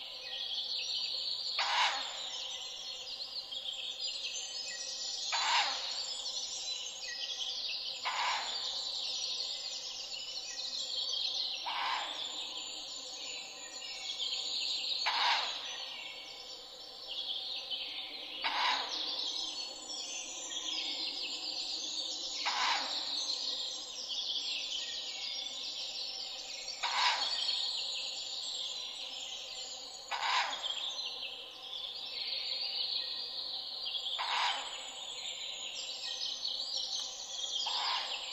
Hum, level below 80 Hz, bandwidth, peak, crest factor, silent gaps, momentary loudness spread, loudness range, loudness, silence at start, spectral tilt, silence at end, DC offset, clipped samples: none; -74 dBFS; 15.5 kHz; -14 dBFS; 24 dB; none; 9 LU; 3 LU; -35 LUFS; 0 s; 2 dB/octave; 0 s; under 0.1%; under 0.1%